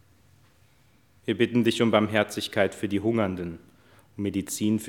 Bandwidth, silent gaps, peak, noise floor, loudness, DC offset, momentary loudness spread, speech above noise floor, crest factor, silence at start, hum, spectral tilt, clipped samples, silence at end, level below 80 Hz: 18 kHz; none; -4 dBFS; -62 dBFS; -26 LUFS; under 0.1%; 15 LU; 36 dB; 24 dB; 1.25 s; none; -5 dB/octave; under 0.1%; 0 s; -68 dBFS